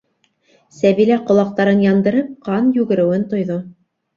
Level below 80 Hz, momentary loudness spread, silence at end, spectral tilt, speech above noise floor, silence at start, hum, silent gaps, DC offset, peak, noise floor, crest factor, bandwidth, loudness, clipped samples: -58 dBFS; 8 LU; 0.45 s; -8 dB/octave; 46 dB; 0.8 s; none; none; under 0.1%; -2 dBFS; -61 dBFS; 14 dB; 7.2 kHz; -16 LUFS; under 0.1%